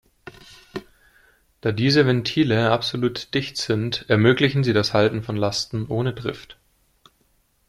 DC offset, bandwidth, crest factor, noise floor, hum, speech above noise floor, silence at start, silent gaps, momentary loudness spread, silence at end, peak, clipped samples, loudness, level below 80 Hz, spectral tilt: under 0.1%; 13.5 kHz; 20 dB; -64 dBFS; none; 43 dB; 0.25 s; none; 16 LU; 1.15 s; -2 dBFS; under 0.1%; -21 LUFS; -54 dBFS; -6 dB/octave